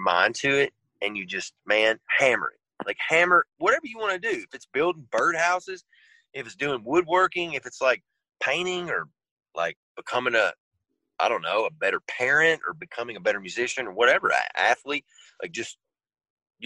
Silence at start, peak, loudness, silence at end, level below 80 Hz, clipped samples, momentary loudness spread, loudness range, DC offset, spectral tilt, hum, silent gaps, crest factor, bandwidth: 0 s; -6 dBFS; -24 LUFS; 0 s; -68 dBFS; under 0.1%; 13 LU; 4 LU; under 0.1%; -3 dB/octave; none; 9.31-9.37 s, 9.76-9.95 s, 10.60-10.71 s, 16.30-16.37 s; 20 dB; 11.5 kHz